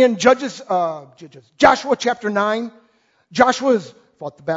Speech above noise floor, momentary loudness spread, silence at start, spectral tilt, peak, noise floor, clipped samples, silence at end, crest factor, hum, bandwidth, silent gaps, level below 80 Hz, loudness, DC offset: 42 dB; 17 LU; 0 s; -4 dB/octave; 0 dBFS; -59 dBFS; under 0.1%; 0 s; 18 dB; none; 8 kHz; none; -54 dBFS; -18 LUFS; under 0.1%